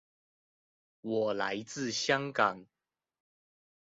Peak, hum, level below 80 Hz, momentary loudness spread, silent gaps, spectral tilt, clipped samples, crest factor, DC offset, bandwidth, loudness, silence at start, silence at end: -12 dBFS; none; -78 dBFS; 9 LU; none; -2.5 dB/octave; under 0.1%; 24 dB; under 0.1%; 7.6 kHz; -32 LUFS; 1.05 s; 1.3 s